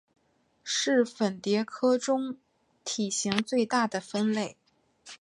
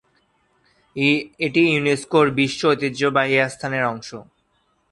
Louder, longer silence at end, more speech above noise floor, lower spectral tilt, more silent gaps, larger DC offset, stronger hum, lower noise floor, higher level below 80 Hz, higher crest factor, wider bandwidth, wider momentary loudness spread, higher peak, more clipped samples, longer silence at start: second, -28 LUFS vs -19 LUFS; second, 0.05 s vs 0.7 s; second, 41 dB vs 46 dB; second, -3.5 dB/octave vs -5 dB/octave; neither; neither; neither; about the same, -69 dBFS vs -66 dBFS; second, -74 dBFS vs -60 dBFS; about the same, 22 dB vs 18 dB; about the same, 11.5 kHz vs 11.5 kHz; about the same, 12 LU vs 12 LU; about the same, -6 dBFS vs -4 dBFS; neither; second, 0.65 s vs 0.95 s